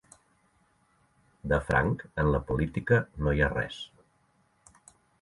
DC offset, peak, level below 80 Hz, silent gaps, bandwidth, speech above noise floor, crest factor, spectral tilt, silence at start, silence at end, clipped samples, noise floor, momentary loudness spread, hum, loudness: under 0.1%; -10 dBFS; -42 dBFS; none; 11.5 kHz; 41 dB; 20 dB; -7.5 dB/octave; 1.45 s; 1.35 s; under 0.1%; -69 dBFS; 12 LU; none; -28 LUFS